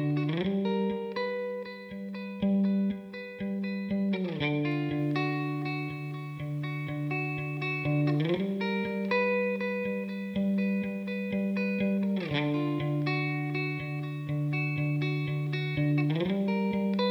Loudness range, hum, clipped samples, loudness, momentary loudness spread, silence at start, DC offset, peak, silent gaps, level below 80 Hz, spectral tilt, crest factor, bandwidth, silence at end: 2 LU; none; under 0.1%; -30 LUFS; 7 LU; 0 s; under 0.1%; -16 dBFS; none; -64 dBFS; -8.5 dB/octave; 14 dB; 6.2 kHz; 0 s